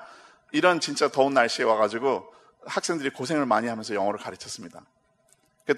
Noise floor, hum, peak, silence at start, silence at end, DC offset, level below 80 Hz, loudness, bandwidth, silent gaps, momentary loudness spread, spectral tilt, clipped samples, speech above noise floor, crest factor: -65 dBFS; none; -4 dBFS; 0 s; 0 s; under 0.1%; -74 dBFS; -25 LUFS; 13 kHz; none; 15 LU; -3.5 dB/octave; under 0.1%; 40 dB; 22 dB